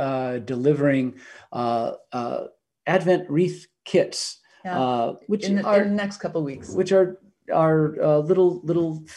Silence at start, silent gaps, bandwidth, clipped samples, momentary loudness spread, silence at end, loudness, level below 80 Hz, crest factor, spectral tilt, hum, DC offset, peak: 0 s; none; 11.5 kHz; under 0.1%; 11 LU; 0 s; -23 LUFS; -66 dBFS; 18 dB; -6.5 dB/octave; none; under 0.1%; -6 dBFS